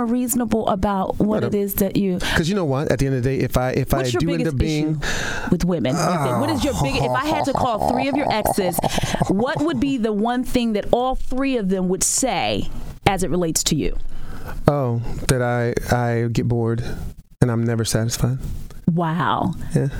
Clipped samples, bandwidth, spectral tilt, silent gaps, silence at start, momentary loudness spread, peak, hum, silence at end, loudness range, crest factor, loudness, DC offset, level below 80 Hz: under 0.1%; 18.5 kHz; -5 dB/octave; none; 0 s; 4 LU; 0 dBFS; none; 0 s; 2 LU; 20 dB; -21 LUFS; under 0.1%; -32 dBFS